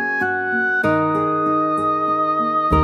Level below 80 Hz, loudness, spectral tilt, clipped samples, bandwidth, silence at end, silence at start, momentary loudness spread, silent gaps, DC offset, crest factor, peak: -38 dBFS; -18 LUFS; -7.5 dB/octave; under 0.1%; 11 kHz; 0 s; 0 s; 2 LU; none; under 0.1%; 14 dB; -4 dBFS